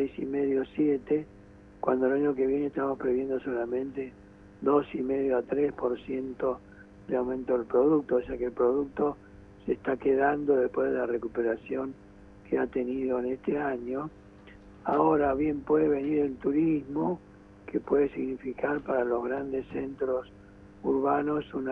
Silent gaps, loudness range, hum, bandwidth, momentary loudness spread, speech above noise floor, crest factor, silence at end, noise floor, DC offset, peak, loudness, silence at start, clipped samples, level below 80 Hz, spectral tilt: none; 3 LU; none; 3.8 kHz; 10 LU; 23 dB; 18 dB; 0 s; -51 dBFS; under 0.1%; -10 dBFS; -29 LUFS; 0 s; under 0.1%; -56 dBFS; -9.5 dB/octave